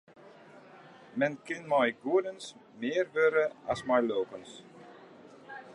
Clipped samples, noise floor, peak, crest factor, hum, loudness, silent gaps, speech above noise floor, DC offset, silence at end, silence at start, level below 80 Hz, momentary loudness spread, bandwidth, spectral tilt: under 0.1%; -54 dBFS; -14 dBFS; 18 dB; none; -30 LUFS; none; 23 dB; under 0.1%; 0 s; 0.25 s; -72 dBFS; 22 LU; 11.5 kHz; -5 dB/octave